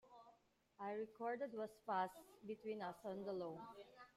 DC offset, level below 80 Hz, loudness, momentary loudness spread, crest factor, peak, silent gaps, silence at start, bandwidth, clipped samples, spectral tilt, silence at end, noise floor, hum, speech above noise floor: under 0.1%; -86 dBFS; -48 LUFS; 15 LU; 20 dB; -30 dBFS; none; 0.05 s; 15.5 kHz; under 0.1%; -6 dB/octave; 0.1 s; -75 dBFS; none; 27 dB